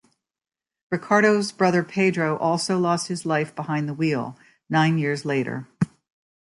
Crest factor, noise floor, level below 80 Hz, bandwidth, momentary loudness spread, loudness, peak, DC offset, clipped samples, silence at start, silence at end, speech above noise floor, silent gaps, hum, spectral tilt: 20 dB; under -90 dBFS; -64 dBFS; 11.5 kHz; 9 LU; -23 LUFS; -4 dBFS; under 0.1%; under 0.1%; 0.9 s; 0.55 s; over 68 dB; none; none; -5.5 dB/octave